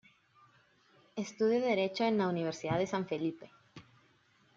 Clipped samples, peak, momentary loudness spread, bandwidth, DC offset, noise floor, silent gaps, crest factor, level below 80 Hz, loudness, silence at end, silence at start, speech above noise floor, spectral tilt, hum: under 0.1%; -18 dBFS; 13 LU; 7.6 kHz; under 0.1%; -68 dBFS; none; 16 dB; -74 dBFS; -33 LUFS; 0.75 s; 1.15 s; 36 dB; -6 dB/octave; none